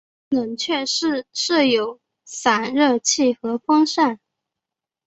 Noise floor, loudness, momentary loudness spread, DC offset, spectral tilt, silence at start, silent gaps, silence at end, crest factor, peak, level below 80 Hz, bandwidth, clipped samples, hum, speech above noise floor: -86 dBFS; -20 LUFS; 8 LU; under 0.1%; -2 dB/octave; 0.3 s; none; 0.9 s; 18 dB; -2 dBFS; -66 dBFS; 8.2 kHz; under 0.1%; none; 66 dB